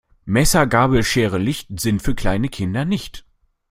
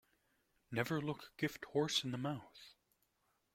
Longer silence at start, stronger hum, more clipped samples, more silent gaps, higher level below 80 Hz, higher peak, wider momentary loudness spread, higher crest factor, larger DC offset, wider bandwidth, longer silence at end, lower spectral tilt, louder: second, 0.25 s vs 0.7 s; neither; neither; neither; first, -32 dBFS vs -76 dBFS; first, -2 dBFS vs -20 dBFS; second, 8 LU vs 12 LU; second, 16 dB vs 22 dB; neither; about the same, 16.5 kHz vs 16.5 kHz; second, 0.5 s vs 0.8 s; about the same, -5 dB/octave vs -4.5 dB/octave; first, -19 LUFS vs -40 LUFS